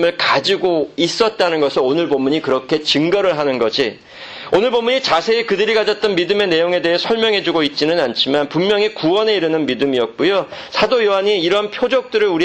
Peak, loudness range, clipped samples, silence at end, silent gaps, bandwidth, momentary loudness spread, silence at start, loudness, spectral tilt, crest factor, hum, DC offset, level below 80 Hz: -2 dBFS; 1 LU; under 0.1%; 0 s; none; 8.8 kHz; 3 LU; 0 s; -16 LUFS; -4.5 dB/octave; 14 dB; none; under 0.1%; -54 dBFS